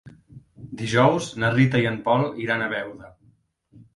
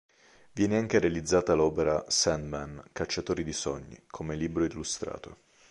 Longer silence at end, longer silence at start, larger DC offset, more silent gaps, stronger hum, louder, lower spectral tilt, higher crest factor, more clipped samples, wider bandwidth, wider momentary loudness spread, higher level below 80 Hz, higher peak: second, 0.15 s vs 0.35 s; second, 0.05 s vs 0.55 s; neither; neither; neither; first, -22 LUFS vs -29 LUFS; first, -6 dB/octave vs -4 dB/octave; about the same, 20 dB vs 20 dB; neither; about the same, 11.5 kHz vs 11.5 kHz; about the same, 13 LU vs 15 LU; second, -56 dBFS vs -50 dBFS; first, -4 dBFS vs -10 dBFS